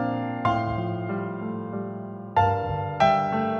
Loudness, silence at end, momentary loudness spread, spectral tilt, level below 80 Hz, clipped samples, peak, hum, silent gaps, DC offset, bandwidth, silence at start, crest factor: -26 LUFS; 0 s; 11 LU; -7.5 dB/octave; -50 dBFS; under 0.1%; -6 dBFS; none; none; under 0.1%; 7 kHz; 0 s; 20 dB